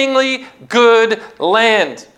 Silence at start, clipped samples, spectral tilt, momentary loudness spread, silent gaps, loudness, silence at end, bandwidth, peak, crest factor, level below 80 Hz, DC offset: 0 s; under 0.1%; -3 dB/octave; 8 LU; none; -13 LUFS; 0.15 s; 11 kHz; -2 dBFS; 12 dB; -66 dBFS; under 0.1%